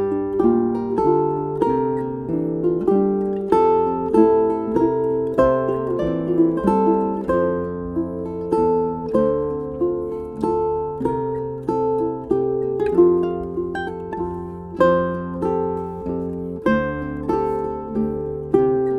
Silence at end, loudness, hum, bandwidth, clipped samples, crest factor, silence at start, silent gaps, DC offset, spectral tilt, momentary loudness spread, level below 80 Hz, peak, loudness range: 0 s; -21 LUFS; none; 9.4 kHz; under 0.1%; 18 dB; 0 s; none; under 0.1%; -9.5 dB/octave; 9 LU; -44 dBFS; -2 dBFS; 4 LU